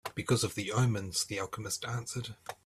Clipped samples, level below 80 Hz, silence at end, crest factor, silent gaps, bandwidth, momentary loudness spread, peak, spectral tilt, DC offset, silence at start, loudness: under 0.1%; -64 dBFS; 0.1 s; 18 dB; none; 15 kHz; 9 LU; -16 dBFS; -4 dB/octave; under 0.1%; 0.05 s; -33 LUFS